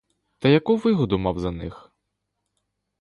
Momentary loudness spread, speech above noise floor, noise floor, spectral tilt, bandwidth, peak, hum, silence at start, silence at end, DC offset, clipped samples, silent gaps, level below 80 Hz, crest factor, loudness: 14 LU; 57 dB; -78 dBFS; -8 dB/octave; 10.5 kHz; -6 dBFS; 50 Hz at -50 dBFS; 0.4 s; 1.25 s; under 0.1%; under 0.1%; none; -46 dBFS; 18 dB; -22 LUFS